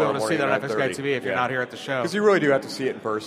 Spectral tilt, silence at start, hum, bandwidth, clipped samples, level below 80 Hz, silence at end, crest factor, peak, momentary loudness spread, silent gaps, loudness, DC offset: -5 dB/octave; 0 s; none; 15.5 kHz; under 0.1%; -66 dBFS; 0 s; 18 dB; -6 dBFS; 8 LU; none; -23 LUFS; under 0.1%